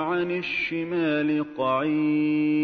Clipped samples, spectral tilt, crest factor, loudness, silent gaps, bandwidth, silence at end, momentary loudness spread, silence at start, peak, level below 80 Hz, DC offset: under 0.1%; -8 dB/octave; 12 dB; -25 LUFS; none; 6 kHz; 0 s; 3 LU; 0 s; -14 dBFS; -66 dBFS; under 0.1%